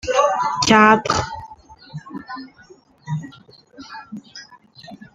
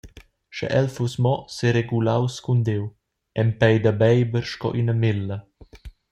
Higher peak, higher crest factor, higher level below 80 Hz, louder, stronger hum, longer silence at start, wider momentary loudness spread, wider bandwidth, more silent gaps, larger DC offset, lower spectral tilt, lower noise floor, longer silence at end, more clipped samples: about the same, -2 dBFS vs -4 dBFS; about the same, 20 dB vs 18 dB; about the same, -50 dBFS vs -50 dBFS; first, -17 LUFS vs -22 LUFS; neither; about the same, 0.05 s vs 0.05 s; first, 26 LU vs 13 LU; about the same, 9.6 kHz vs 9 kHz; neither; neither; second, -4 dB/octave vs -7 dB/octave; about the same, -49 dBFS vs -47 dBFS; about the same, 0.1 s vs 0.2 s; neither